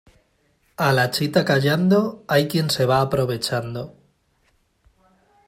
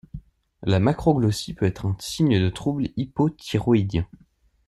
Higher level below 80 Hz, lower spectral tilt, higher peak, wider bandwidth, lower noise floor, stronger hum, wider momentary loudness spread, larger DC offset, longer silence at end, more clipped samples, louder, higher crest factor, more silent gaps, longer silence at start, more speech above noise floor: second, -56 dBFS vs -46 dBFS; second, -5.5 dB/octave vs -7 dB/octave; about the same, -4 dBFS vs -6 dBFS; first, 16 kHz vs 13 kHz; first, -64 dBFS vs -43 dBFS; neither; first, 12 LU vs 9 LU; neither; first, 1.6 s vs 0.65 s; neither; first, -20 LUFS vs -23 LUFS; about the same, 18 dB vs 18 dB; neither; first, 0.8 s vs 0.15 s; first, 45 dB vs 21 dB